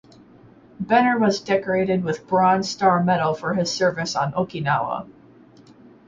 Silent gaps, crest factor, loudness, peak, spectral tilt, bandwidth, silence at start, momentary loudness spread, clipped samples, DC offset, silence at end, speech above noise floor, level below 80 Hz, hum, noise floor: none; 16 dB; -21 LUFS; -6 dBFS; -5.5 dB/octave; 7.6 kHz; 0.8 s; 6 LU; under 0.1%; under 0.1%; 0.95 s; 29 dB; -58 dBFS; none; -49 dBFS